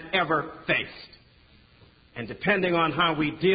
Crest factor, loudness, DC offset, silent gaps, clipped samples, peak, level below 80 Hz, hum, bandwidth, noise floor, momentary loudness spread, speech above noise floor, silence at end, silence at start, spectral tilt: 18 dB; -25 LUFS; under 0.1%; none; under 0.1%; -8 dBFS; -58 dBFS; none; 5 kHz; -57 dBFS; 16 LU; 31 dB; 0 s; 0 s; -9.5 dB/octave